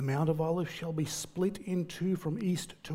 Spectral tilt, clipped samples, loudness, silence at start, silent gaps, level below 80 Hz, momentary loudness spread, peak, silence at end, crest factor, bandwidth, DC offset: -6 dB/octave; under 0.1%; -33 LUFS; 0 s; none; -62 dBFS; 5 LU; -16 dBFS; 0 s; 16 dB; 16 kHz; under 0.1%